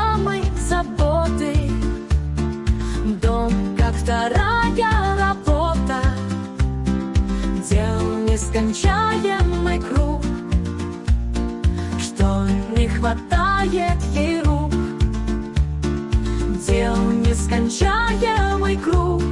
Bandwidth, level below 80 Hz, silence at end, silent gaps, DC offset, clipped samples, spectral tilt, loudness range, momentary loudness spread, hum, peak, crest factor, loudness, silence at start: 11.5 kHz; -24 dBFS; 0 s; none; under 0.1%; under 0.1%; -6 dB/octave; 2 LU; 5 LU; none; -6 dBFS; 12 dB; -20 LUFS; 0 s